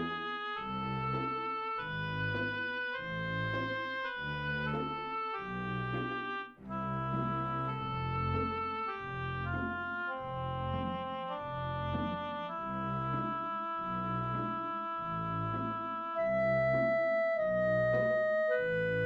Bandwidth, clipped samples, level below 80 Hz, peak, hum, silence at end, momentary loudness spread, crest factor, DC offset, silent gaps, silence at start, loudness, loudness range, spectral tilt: 6.6 kHz; under 0.1%; -56 dBFS; -22 dBFS; none; 0 s; 8 LU; 12 dB; under 0.1%; none; 0 s; -35 LUFS; 5 LU; -8 dB/octave